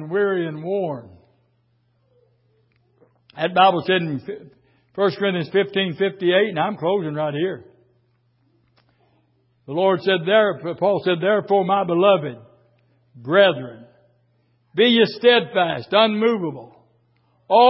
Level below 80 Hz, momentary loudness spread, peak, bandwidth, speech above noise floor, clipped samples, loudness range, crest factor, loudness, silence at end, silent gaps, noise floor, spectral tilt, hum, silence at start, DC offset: -68 dBFS; 14 LU; -2 dBFS; 5.8 kHz; 45 dB; under 0.1%; 7 LU; 18 dB; -19 LUFS; 0 s; none; -64 dBFS; -10 dB/octave; none; 0 s; under 0.1%